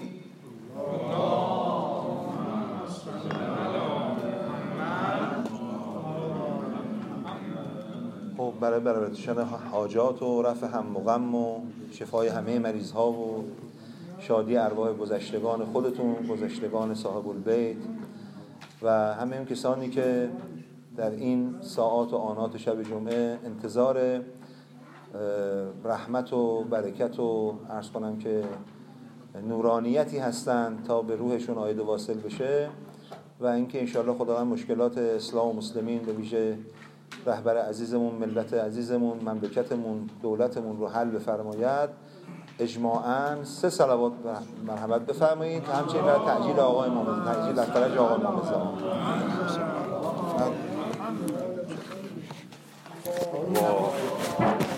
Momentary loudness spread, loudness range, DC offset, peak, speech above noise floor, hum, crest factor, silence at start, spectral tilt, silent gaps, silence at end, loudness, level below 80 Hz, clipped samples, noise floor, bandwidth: 14 LU; 5 LU; under 0.1%; -10 dBFS; 21 dB; none; 20 dB; 0 s; -6.5 dB/octave; none; 0 s; -29 LUFS; -76 dBFS; under 0.1%; -49 dBFS; 16 kHz